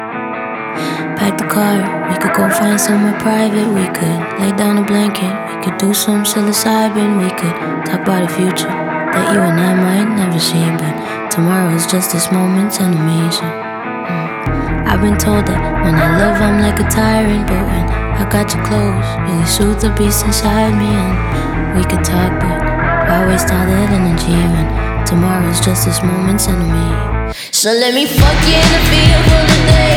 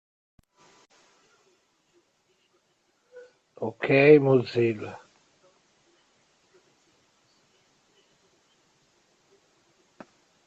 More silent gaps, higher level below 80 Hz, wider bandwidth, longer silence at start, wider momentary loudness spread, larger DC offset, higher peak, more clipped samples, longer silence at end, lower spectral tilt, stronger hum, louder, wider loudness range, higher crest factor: neither; first, -22 dBFS vs -72 dBFS; first, 19.5 kHz vs 7.8 kHz; second, 0 s vs 3.6 s; second, 8 LU vs 21 LU; neither; first, 0 dBFS vs -4 dBFS; neither; second, 0 s vs 5.5 s; second, -5 dB/octave vs -8 dB/octave; neither; first, -13 LUFS vs -22 LUFS; second, 2 LU vs 12 LU; second, 12 dB vs 24 dB